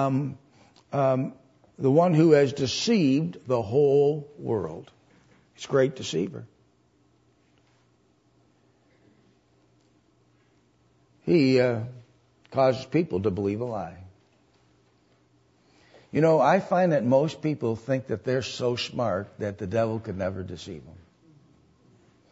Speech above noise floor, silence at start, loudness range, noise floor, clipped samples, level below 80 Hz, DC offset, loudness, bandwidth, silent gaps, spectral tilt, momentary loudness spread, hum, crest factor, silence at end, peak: 40 dB; 0 s; 9 LU; -65 dBFS; under 0.1%; -64 dBFS; under 0.1%; -25 LUFS; 8 kHz; none; -6.5 dB/octave; 15 LU; none; 20 dB; 1.4 s; -6 dBFS